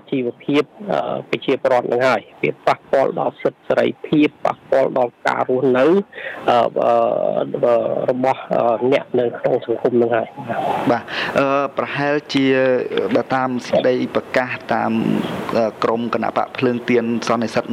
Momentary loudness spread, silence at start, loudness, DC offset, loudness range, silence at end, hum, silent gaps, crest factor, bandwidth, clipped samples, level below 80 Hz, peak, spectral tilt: 5 LU; 0.05 s; -18 LUFS; under 0.1%; 2 LU; 0 s; none; none; 14 dB; 13.5 kHz; under 0.1%; -62 dBFS; -4 dBFS; -6.5 dB/octave